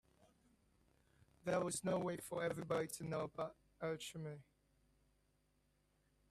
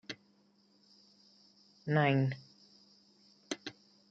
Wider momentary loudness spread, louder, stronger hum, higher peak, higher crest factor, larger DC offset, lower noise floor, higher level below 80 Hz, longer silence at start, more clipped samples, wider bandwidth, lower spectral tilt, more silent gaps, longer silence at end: second, 9 LU vs 19 LU; second, -44 LUFS vs -34 LUFS; first, 50 Hz at -70 dBFS vs none; second, -26 dBFS vs -16 dBFS; about the same, 20 dB vs 22 dB; neither; first, -79 dBFS vs -69 dBFS; first, -76 dBFS vs -82 dBFS; first, 1.45 s vs 0.1 s; neither; first, 15 kHz vs 7.8 kHz; second, -5 dB/octave vs -6.5 dB/octave; neither; first, 1.9 s vs 0.4 s